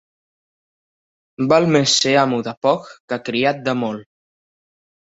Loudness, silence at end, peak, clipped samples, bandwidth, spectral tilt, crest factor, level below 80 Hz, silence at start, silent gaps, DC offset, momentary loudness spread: -18 LUFS; 1.05 s; -2 dBFS; under 0.1%; 8.2 kHz; -4 dB/octave; 18 dB; -62 dBFS; 1.4 s; 2.57-2.61 s, 3.00-3.08 s; under 0.1%; 12 LU